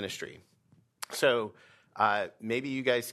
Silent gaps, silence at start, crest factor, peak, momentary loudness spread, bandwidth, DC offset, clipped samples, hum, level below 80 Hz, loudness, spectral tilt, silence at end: none; 0 s; 22 dB; -10 dBFS; 16 LU; 13.5 kHz; under 0.1%; under 0.1%; none; -78 dBFS; -30 LUFS; -3.5 dB/octave; 0 s